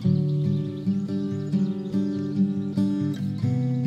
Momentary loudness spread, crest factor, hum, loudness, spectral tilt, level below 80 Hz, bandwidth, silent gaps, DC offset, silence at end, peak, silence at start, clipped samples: 3 LU; 12 dB; none; -26 LUFS; -9.5 dB/octave; -62 dBFS; 7.6 kHz; none; under 0.1%; 0 s; -12 dBFS; 0 s; under 0.1%